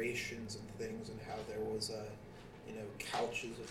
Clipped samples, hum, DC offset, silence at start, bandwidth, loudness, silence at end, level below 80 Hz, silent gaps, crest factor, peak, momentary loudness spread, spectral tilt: under 0.1%; none; under 0.1%; 0 s; 16 kHz; -43 LUFS; 0 s; -62 dBFS; none; 18 dB; -26 dBFS; 11 LU; -4 dB/octave